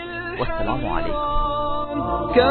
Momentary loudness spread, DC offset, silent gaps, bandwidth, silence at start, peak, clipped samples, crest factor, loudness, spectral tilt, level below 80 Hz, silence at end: 6 LU; under 0.1%; none; 4.5 kHz; 0 s; -4 dBFS; under 0.1%; 18 dB; -23 LUFS; -9.5 dB/octave; -30 dBFS; 0 s